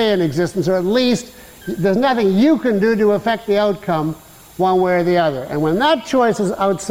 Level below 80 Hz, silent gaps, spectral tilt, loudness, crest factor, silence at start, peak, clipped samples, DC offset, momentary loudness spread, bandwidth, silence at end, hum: -50 dBFS; none; -6 dB/octave; -17 LUFS; 12 dB; 0 s; -6 dBFS; under 0.1%; 0.4%; 7 LU; 16.5 kHz; 0 s; none